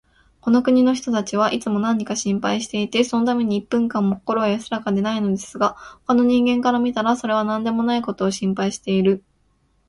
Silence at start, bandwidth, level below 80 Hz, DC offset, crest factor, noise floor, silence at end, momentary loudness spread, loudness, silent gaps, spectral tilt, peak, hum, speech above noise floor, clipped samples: 0.45 s; 11.5 kHz; -56 dBFS; under 0.1%; 16 dB; -63 dBFS; 0.7 s; 6 LU; -20 LUFS; none; -5.5 dB/octave; -4 dBFS; none; 43 dB; under 0.1%